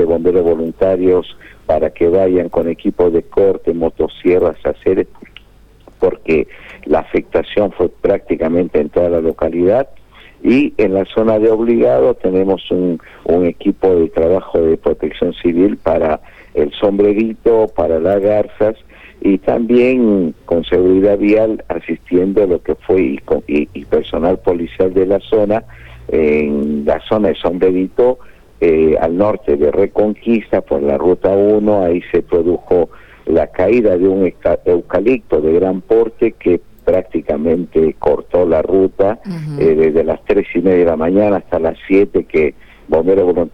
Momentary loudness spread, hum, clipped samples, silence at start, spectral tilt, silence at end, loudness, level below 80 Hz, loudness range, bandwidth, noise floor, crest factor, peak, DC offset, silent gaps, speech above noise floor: 6 LU; none; under 0.1%; 0 s; -9 dB/octave; 0.05 s; -14 LUFS; -38 dBFS; 2 LU; 5.6 kHz; -44 dBFS; 12 dB; -2 dBFS; under 0.1%; none; 31 dB